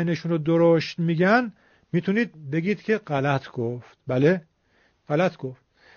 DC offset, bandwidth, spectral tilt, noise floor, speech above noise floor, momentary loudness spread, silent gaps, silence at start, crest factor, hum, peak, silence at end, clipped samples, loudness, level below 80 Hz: under 0.1%; 6.8 kHz; -6 dB/octave; -64 dBFS; 41 dB; 11 LU; none; 0 s; 18 dB; none; -6 dBFS; 0.4 s; under 0.1%; -24 LUFS; -64 dBFS